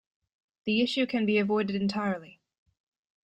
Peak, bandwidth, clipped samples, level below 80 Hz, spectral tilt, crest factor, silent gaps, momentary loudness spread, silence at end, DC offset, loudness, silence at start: -16 dBFS; 9 kHz; under 0.1%; -70 dBFS; -6 dB/octave; 16 dB; none; 8 LU; 0.95 s; under 0.1%; -28 LUFS; 0.65 s